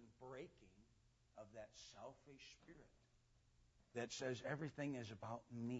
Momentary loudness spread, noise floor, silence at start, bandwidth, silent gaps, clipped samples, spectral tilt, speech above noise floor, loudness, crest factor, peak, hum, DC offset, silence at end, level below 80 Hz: 16 LU; -76 dBFS; 0 s; 7.6 kHz; none; under 0.1%; -5 dB/octave; 25 dB; -52 LUFS; 20 dB; -32 dBFS; none; under 0.1%; 0 s; -78 dBFS